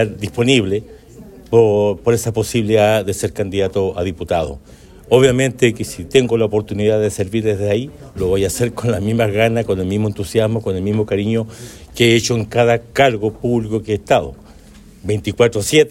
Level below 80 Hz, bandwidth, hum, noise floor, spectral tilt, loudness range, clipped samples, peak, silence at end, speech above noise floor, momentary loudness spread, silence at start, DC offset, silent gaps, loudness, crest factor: -42 dBFS; 16.5 kHz; none; -41 dBFS; -5.5 dB/octave; 2 LU; under 0.1%; 0 dBFS; 0 s; 25 dB; 8 LU; 0 s; under 0.1%; none; -17 LUFS; 16 dB